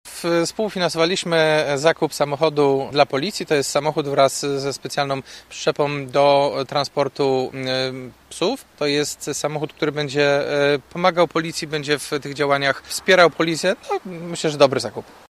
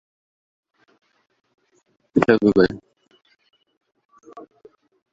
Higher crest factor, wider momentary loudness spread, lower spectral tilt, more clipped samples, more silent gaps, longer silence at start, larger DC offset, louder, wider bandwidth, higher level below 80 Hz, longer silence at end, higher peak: about the same, 20 dB vs 22 dB; second, 8 LU vs 28 LU; second, -4 dB/octave vs -7.5 dB/octave; neither; second, none vs 3.77-3.81 s, 4.05-4.09 s; second, 0.05 s vs 2.15 s; neither; about the same, -20 LUFS vs -18 LUFS; first, 15 kHz vs 7.8 kHz; about the same, -58 dBFS vs -54 dBFS; second, 0.25 s vs 0.7 s; about the same, 0 dBFS vs -2 dBFS